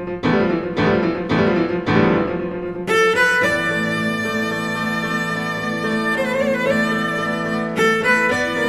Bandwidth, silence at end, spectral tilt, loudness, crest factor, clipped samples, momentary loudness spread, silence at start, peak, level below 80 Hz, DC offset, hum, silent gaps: 15 kHz; 0 s; -5.5 dB/octave; -18 LUFS; 18 dB; under 0.1%; 6 LU; 0 s; -2 dBFS; -46 dBFS; 0.2%; none; none